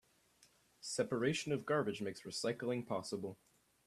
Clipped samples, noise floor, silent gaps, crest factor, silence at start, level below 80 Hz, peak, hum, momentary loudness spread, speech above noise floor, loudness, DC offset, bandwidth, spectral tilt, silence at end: under 0.1%; -71 dBFS; none; 20 dB; 0.8 s; -78 dBFS; -22 dBFS; none; 8 LU; 32 dB; -39 LUFS; under 0.1%; 14 kHz; -4.5 dB/octave; 0.5 s